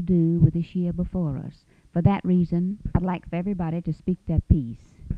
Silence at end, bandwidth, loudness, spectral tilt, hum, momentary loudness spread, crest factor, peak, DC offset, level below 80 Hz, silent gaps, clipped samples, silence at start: 0 s; 4.7 kHz; -25 LUFS; -11 dB/octave; none; 9 LU; 20 dB; -4 dBFS; under 0.1%; -36 dBFS; none; under 0.1%; 0 s